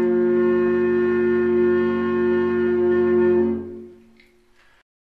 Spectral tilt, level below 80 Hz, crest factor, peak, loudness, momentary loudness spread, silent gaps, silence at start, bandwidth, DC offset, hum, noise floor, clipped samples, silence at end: -9 dB/octave; -56 dBFS; 10 dB; -10 dBFS; -19 LUFS; 4 LU; none; 0 s; 4.2 kHz; under 0.1%; none; -56 dBFS; under 0.1%; 1.15 s